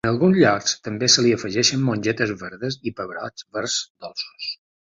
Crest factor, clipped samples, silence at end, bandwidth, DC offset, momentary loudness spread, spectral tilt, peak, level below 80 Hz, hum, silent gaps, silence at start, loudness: 18 dB; under 0.1%; 0.35 s; 8 kHz; under 0.1%; 15 LU; -3.5 dB/octave; -4 dBFS; -56 dBFS; none; 3.90-3.95 s; 0.05 s; -21 LUFS